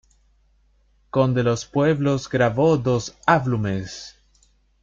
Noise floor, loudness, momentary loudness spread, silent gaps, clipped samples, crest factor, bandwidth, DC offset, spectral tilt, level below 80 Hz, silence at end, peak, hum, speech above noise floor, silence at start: -60 dBFS; -21 LUFS; 10 LU; none; under 0.1%; 20 dB; 7.6 kHz; under 0.1%; -6.5 dB/octave; -52 dBFS; 0.7 s; -2 dBFS; none; 40 dB; 1.15 s